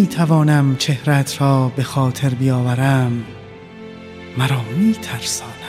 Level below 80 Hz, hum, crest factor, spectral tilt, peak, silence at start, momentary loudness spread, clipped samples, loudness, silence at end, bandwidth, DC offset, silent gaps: -52 dBFS; none; 16 dB; -6 dB/octave; -2 dBFS; 0 s; 20 LU; under 0.1%; -17 LUFS; 0 s; 15 kHz; under 0.1%; none